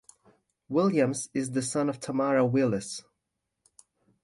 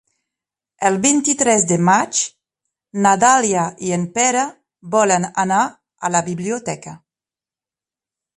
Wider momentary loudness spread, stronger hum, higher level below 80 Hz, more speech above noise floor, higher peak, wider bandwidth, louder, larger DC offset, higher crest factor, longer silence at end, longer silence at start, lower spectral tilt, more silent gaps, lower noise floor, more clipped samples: second, 8 LU vs 12 LU; neither; second, -68 dBFS vs -62 dBFS; second, 56 dB vs over 73 dB; second, -12 dBFS vs 0 dBFS; about the same, 11.5 kHz vs 11.5 kHz; second, -27 LUFS vs -17 LUFS; neither; about the same, 18 dB vs 18 dB; second, 1.25 s vs 1.4 s; about the same, 0.7 s vs 0.8 s; first, -5.5 dB/octave vs -3.5 dB/octave; neither; second, -83 dBFS vs under -90 dBFS; neither